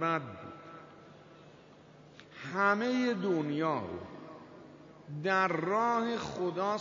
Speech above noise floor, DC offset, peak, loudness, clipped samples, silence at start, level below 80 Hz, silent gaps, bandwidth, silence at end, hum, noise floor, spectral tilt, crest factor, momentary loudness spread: 25 dB; under 0.1%; -14 dBFS; -32 LUFS; under 0.1%; 0 s; -72 dBFS; none; 7.4 kHz; 0 s; none; -56 dBFS; -4 dB/octave; 20 dB; 23 LU